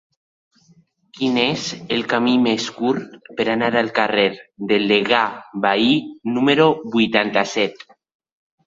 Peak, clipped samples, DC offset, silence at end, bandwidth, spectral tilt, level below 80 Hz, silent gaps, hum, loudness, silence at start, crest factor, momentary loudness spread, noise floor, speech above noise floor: -2 dBFS; under 0.1%; under 0.1%; 0.95 s; 7.8 kHz; -4.5 dB/octave; -62 dBFS; none; none; -19 LUFS; 1.15 s; 18 dB; 8 LU; -56 dBFS; 37 dB